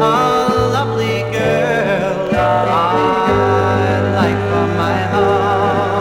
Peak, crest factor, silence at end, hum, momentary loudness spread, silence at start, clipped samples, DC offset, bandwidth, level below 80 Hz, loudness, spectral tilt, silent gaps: -2 dBFS; 12 dB; 0 s; none; 3 LU; 0 s; under 0.1%; under 0.1%; 16 kHz; -40 dBFS; -15 LUFS; -6.5 dB/octave; none